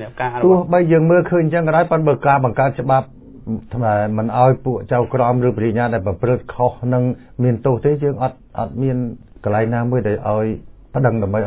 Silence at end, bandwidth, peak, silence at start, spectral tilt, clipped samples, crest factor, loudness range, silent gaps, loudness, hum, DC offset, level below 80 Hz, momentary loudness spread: 0 s; 4 kHz; -2 dBFS; 0 s; -12.5 dB/octave; under 0.1%; 14 dB; 4 LU; none; -17 LUFS; none; under 0.1%; -42 dBFS; 10 LU